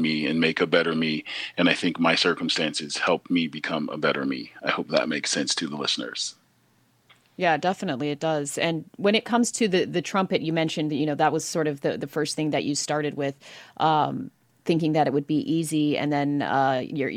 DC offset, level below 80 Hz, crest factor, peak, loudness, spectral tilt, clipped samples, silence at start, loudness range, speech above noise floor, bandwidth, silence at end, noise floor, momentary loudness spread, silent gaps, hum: under 0.1%; -72 dBFS; 22 dB; -4 dBFS; -25 LUFS; -4 dB/octave; under 0.1%; 0 s; 3 LU; 39 dB; 15.5 kHz; 0 s; -64 dBFS; 7 LU; none; none